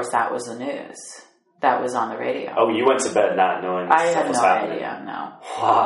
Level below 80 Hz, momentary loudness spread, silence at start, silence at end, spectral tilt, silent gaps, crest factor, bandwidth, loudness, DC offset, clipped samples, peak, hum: -72 dBFS; 14 LU; 0 s; 0 s; -3.5 dB/octave; none; 20 dB; 11.5 kHz; -21 LUFS; under 0.1%; under 0.1%; -2 dBFS; none